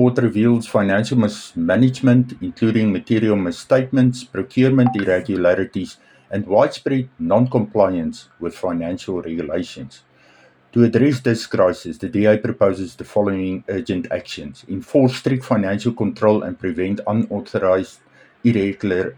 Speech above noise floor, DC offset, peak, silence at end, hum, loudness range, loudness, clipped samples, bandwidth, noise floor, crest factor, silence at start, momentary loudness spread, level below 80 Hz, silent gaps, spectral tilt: 33 dB; under 0.1%; -2 dBFS; 0.05 s; none; 4 LU; -19 LUFS; under 0.1%; 11.5 kHz; -52 dBFS; 16 dB; 0 s; 10 LU; -56 dBFS; none; -7.5 dB/octave